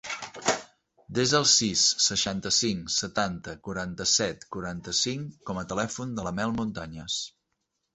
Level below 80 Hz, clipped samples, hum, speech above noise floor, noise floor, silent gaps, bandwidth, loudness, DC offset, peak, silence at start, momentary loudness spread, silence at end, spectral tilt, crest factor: -56 dBFS; under 0.1%; none; 51 dB; -79 dBFS; none; 8.4 kHz; -26 LUFS; under 0.1%; -8 dBFS; 0.05 s; 15 LU; 0.65 s; -2 dB/octave; 20 dB